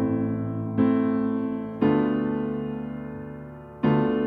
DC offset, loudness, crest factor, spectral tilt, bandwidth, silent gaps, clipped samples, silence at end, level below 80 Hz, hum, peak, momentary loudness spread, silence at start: under 0.1%; -25 LUFS; 16 dB; -11 dB/octave; 4.6 kHz; none; under 0.1%; 0 s; -54 dBFS; none; -10 dBFS; 14 LU; 0 s